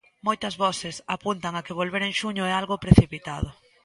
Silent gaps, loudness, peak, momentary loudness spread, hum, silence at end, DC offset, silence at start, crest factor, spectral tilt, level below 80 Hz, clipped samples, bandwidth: none; -25 LUFS; 0 dBFS; 14 LU; none; 0.3 s; under 0.1%; 0.25 s; 24 dB; -5.5 dB/octave; -38 dBFS; under 0.1%; 11.5 kHz